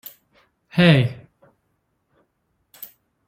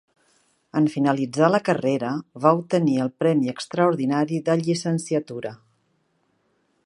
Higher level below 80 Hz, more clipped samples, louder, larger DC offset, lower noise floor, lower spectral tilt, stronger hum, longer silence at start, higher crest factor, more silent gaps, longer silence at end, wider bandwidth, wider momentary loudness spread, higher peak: first, -56 dBFS vs -72 dBFS; neither; first, -18 LUFS vs -22 LUFS; neither; about the same, -71 dBFS vs -68 dBFS; about the same, -7 dB/octave vs -6.5 dB/octave; neither; about the same, 0.75 s vs 0.75 s; about the same, 20 dB vs 22 dB; neither; second, 0.45 s vs 1.3 s; first, 16 kHz vs 11.5 kHz; first, 26 LU vs 7 LU; about the same, -4 dBFS vs -2 dBFS